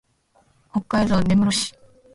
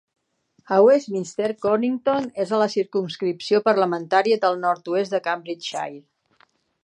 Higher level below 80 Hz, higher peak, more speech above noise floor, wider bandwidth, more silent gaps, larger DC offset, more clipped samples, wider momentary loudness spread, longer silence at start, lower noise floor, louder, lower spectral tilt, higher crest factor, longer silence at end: first, -44 dBFS vs -72 dBFS; second, -8 dBFS vs -4 dBFS; about the same, 42 dB vs 44 dB; first, 11.5 kHz vs 10 kHz; neither; neither; neither; about the same, 11 LU vs 11 LU; about the same, 0.75 s vs 0.7 s; second, -61 dBFS vs -65 dBFS; about the same, -21 LUFS vs -22 LUFS; about the same, -5 dB/octave vs -5 dB/octave; about the same, 14 dB vs 18 dB; second, 0.45 s vs 0.85 s